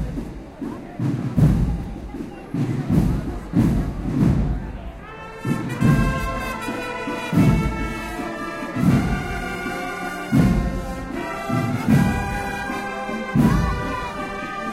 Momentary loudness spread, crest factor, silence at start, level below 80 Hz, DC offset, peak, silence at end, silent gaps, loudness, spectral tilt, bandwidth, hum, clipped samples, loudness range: 13 LU; 14 dB; 0 s; -30 dBFS; under 0.1%; -6 dBFS; 0 s; none; -23 LUFS; -7 dB/octave; 16 kHz; none; under 0.1%; 1 LU